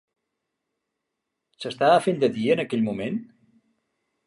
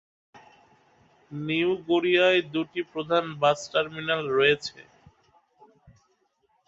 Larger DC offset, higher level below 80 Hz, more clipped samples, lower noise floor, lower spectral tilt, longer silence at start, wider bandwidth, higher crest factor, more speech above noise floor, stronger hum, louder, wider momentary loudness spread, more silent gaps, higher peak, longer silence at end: neither; about the same, -68 dBFS vs -68 dBFS; neither; first, -82 dBFS vs -70 dBFS; about the same, -6 dB/octave vs -5 dB/octave; first, 1.6 s vs 0.35 s; first, 11.5 kHz vs 8 kHz; about the same, 20 dB vs 20 dB; first, 59 dB vs 45 dB; neither; about the same, -23 LUFS vs -25 LUFS; first, 14 LU vs 11 LU; neither; about the same, -6 dBFS vs -8 dBFS; second, 1.05 s vs 1.85 s